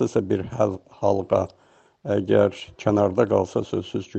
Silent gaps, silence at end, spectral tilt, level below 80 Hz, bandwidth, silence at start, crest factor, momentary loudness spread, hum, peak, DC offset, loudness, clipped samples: none; 0 s; -7.5 dB/octave; -56 dBFS; 8.4 kHz; 0 s; 18 dB; 8 LU; none; -4 dBFS; under 0.1%; -23 LUFS; under 0.1%